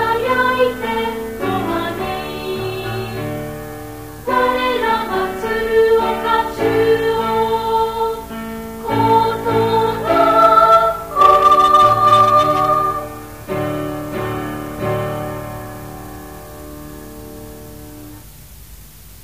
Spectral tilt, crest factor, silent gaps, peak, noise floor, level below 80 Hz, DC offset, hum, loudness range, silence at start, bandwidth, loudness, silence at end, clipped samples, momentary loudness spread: -5.5 dB/octave; 16 dB; none; 0 dBFS; -39 dBFS; -40 dBFS; 0.4%; none; 16 LU; 0 s; 15.5 kHz; -16 LUFS; 0 s; under 0.1%; 23 LU